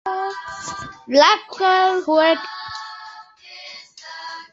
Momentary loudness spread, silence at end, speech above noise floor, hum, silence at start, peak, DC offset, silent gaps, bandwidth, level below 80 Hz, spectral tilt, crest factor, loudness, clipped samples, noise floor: 22 LU; 0.05 s; 25 dB; none; 0.05 s; -2 dBFS; under 0.1%; none; 8 kHz; -62 dBFS; -2.5 dB/octave; 20 dB; -18 LUFS; under 0.1%; -41 dBFS